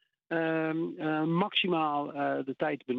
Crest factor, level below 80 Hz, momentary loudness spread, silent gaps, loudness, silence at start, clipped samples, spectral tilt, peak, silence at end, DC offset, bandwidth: 16 dB; -82 dBFS; 6 LU; none; -30 LUFS; 0.3 s; under 0.1%; -8.5 dB/octave; -16 dBFS; 0 s; under 0.1%; 4.9 kHz